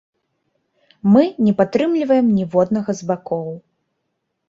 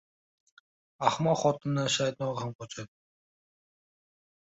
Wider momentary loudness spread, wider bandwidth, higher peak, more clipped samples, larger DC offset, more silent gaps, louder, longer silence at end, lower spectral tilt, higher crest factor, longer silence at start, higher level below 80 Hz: second, 11 LU vs 15 LU; about the same, 7.6 kHz vs 8 kHz; first, -2 dBFS vs -8 dBFS; neither; neither; second, none vs 2.55-2.59 s; first, -17 LUFS vs -29 LUFS; second, 0.9 s vs 1.65 s; first, -8 dB/octave vs -4.5 dB/octave; second, 18 dB vs 24 dB; about the same, 1.05 s vs 1 s; first, -58 dBFS vs -70 dBFS